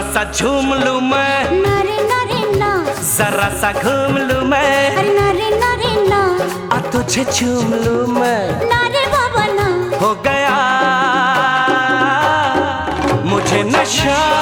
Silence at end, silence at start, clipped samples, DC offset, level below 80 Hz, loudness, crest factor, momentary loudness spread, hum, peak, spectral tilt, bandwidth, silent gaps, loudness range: 0 s; 0 s; under 0.1%; under 0.1%; -38 dBFS; -14 LUFS; 14 dB; 4 LU; none; -2 dBFS; -4 dB/octave; over 20 kHz; none; 2 LU